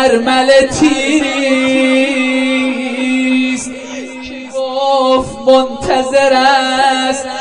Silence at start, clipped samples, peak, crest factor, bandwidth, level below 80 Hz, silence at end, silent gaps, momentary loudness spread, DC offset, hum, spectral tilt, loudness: 0 s; under 0.1%; 0 dBFS; 12 dB; 10 kHz; -42 dBFS; 0 s; none; 11 LU; 0.3%; none; -3 dB/octave; -12 LUFS